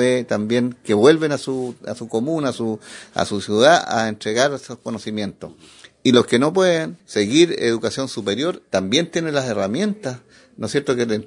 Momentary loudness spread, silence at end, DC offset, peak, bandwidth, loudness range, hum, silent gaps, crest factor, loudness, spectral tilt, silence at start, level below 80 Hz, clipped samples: 14 LU; 0 s; under 0.1%; 0 dBFS; 11 kHz; 2 LU; none; none; 20 dB; -19 LUFS; -4.5 dB/octave; 0 s; -62 dBFS; under 0.1%